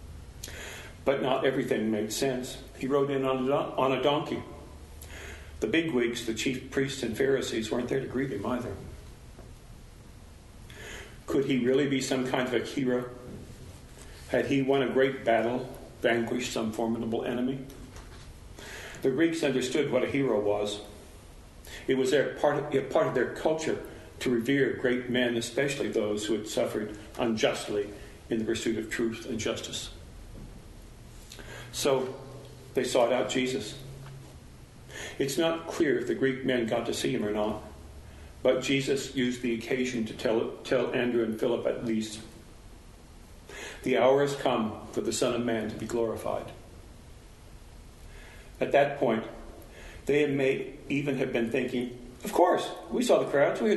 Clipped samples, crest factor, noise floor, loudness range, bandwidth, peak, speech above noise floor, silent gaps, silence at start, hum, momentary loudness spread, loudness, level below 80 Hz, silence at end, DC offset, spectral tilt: under 0.1%; 20 dB; -50 dBFS; 5 LU; 12 kHz; -8 dBFS; 22 dB; none; 0 s; none; 21 LU; -29 LUFS; -52 dBFS; 0 s; under 0.1%; -5 dB/octave